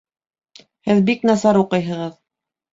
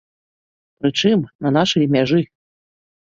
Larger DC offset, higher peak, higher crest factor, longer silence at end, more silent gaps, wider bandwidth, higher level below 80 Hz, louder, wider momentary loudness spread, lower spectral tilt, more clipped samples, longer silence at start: neither; about the same, -2 dBFS vs -2 dBFS; about the same, 18 dB vs 16 dB; second, 0.6 s vs 0.9 s; second, none vs 1.35-1.39 s; about the same, 7.8 kHz vs 7.6 kHz; about the same, -58 dBFS vs -58 dBFS; about the same, -17 LUFS vs -18 LUFS; first, 13 LU vs 6 LU; about the same, -6.5 dB/octave vs -6 dB/octave; neither; about the same, 0.85 s vs 0.85 s